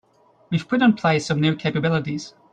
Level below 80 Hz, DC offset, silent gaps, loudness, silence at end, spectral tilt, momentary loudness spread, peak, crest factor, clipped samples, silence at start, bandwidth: -58 dBFS; under 0.1%; none; -21 LUFS; 0.25 s; -6.5 dB/octave; 10 LU; -6 dBFS; 16 dB; under 0.1%; 0.5 s; 9.2 kHz